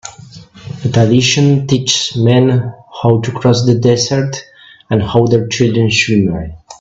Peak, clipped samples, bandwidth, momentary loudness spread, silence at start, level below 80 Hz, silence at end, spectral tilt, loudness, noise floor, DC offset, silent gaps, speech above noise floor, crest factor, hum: 0 dBFS; under 0.1%; 7.8 kHz; 12 LU; 0.05 s; -42 dBFS; 0.05 s; -5.5 dB/octave; -12 LUFS; -36 dBFS; under 0.1%; none; 24 dB; 12 dB; none